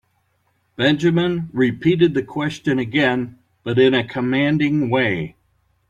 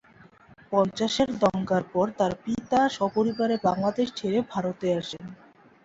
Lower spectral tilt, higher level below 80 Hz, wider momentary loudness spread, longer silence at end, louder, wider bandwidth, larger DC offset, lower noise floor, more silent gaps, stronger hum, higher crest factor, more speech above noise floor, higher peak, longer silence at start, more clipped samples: first, -7 dB/octave vs -5.5 dB/octave; first, -54 dBFS vs -60 dBFS; first, 9 LU vs 6 LU; about the same, 0.6 s vs 0.5 s; first, -19 LUFS vs -26 LUFS; first, 9.2 kHz vs 8 kHz; neither; first, -65 dBFS vs -54 dBFS; neither; neither; about the same, 16 dB vs 18 dB; first, 47 dB vs 28 dB; first, -4 dBFS vs -8 dBFS; about the same, 0.8 s vs 0.7 s; neither